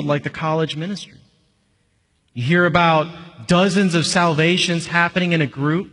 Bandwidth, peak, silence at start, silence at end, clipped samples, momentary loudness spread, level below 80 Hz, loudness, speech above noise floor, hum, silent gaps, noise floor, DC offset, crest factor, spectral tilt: 11 kHz; -2 dBFS; 0 s; 0.05 s; under 0.1%; 13 LU; -52 dBFS; -18 LUFS; 46 dB; none; none; -64 dBFS; under 0.1%; 16 dB; -5 dB/octave